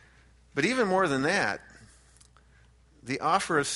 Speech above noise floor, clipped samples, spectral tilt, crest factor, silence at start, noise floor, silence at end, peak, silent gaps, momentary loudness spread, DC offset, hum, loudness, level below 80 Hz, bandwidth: 32 dB; under 0.1%; -4 dB/octave; 20 dB; 0.55 s; -59 dBFS; 0 s; -10 dBFS; none; 11 LU; under 0.1%; none; -27 LUFS; -60 dBFS; 11.5 kHz